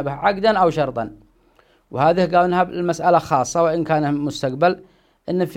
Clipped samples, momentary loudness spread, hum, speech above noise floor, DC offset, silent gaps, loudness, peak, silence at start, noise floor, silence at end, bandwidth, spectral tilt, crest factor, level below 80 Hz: under 0.1%; 11 LU; none; 38 dB; under 0.1%; none; -19 LUFS; -2 dBFS; 0 s; -57 dBFS; 0 s; 15.5 kHz; -6 dB/octave; 18 dB; -52 dBFS